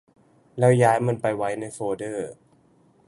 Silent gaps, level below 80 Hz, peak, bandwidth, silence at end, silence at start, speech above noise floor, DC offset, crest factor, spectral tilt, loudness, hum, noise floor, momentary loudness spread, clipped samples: none; -64 dBFS; -4 dBFS; 11.5 kHz; 0.75 s; 0.55 s; 37 dB; under 0.1%; 20 dB; -7 dB/octave; -23 LUFS; none; -59 dBFS; 15 LU; under 0.1%